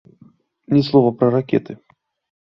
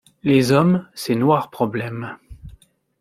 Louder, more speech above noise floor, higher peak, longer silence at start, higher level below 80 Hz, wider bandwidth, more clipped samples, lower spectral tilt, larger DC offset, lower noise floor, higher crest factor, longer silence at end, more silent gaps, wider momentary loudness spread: about the same, -17 LUFS vs -19 LUFS; about the same, 35 dB vs 32 dB; about the same, -2 dBFS vs -2 dBFS; first, 0.7 s vs 0.25 s; second, -58 dBFS vs -50 dBFS; second, 6 kHz vs 15.5 kHz; neither; first, -9.5 dB/octave vs -6.5 dB/octave; neither; about the same, -52 dBFS vs -50 dBFS; about the same, 18 dB vs 18 dB; first, 0.7 s vs 0.5 s; neither; first, 19 LU vs 16 LU